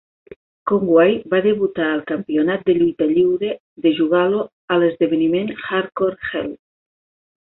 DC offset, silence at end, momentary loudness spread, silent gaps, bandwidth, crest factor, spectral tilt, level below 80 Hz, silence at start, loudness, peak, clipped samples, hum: under 0.1%; 0.85 s; 8 LU; 3.60-3.76 s, 4.53-4.68 s; 4.1 kHz; 16 dB; -11 dB/octave; -58 dBFS; 0.65 s; -18 LUFS; -2 dBFS; under 0.1%; none